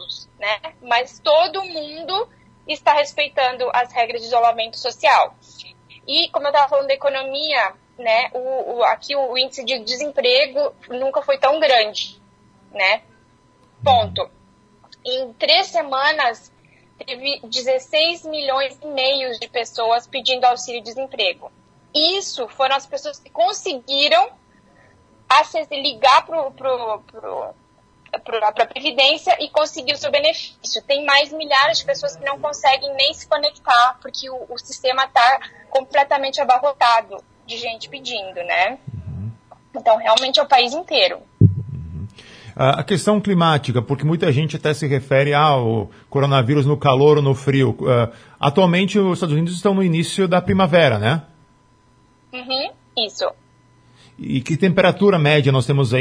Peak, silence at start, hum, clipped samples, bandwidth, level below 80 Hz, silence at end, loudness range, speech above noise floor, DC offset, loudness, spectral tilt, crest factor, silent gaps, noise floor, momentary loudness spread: 0 dBFS; 0 s; none; under 0.1%; 10.5 kHz; -52 dBFS; 0 s; 4 LU; 36 dB; under 0.1%; -18 LUFS; -5 dB/octave; 18 dB; none; -55 dBFS; 14 LU